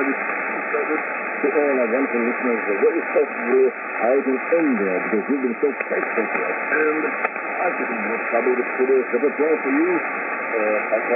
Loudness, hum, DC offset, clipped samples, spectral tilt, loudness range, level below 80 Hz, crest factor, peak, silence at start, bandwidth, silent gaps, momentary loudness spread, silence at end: -21 LUFS; none; under 0.1%; under 0.1%; -10.5 dB/octave; 2 LU; -86 dBFS; 14 dB; -6 dBFS; 0 s; 3.7 kHz; none; 4 LU; 0 s